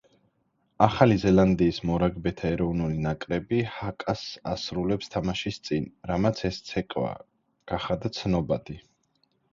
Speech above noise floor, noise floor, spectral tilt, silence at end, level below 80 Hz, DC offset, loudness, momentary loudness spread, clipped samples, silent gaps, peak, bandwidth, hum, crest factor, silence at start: 46 dB; -72 dBFS; -7 dB/octave; 0.75 s; -46 dBFS; under 0.1%; -27 LUFS; 12 LU; under 0.1%; none; -2 dBFS; 7.6 kHz; none; 24 dB; 0.8 s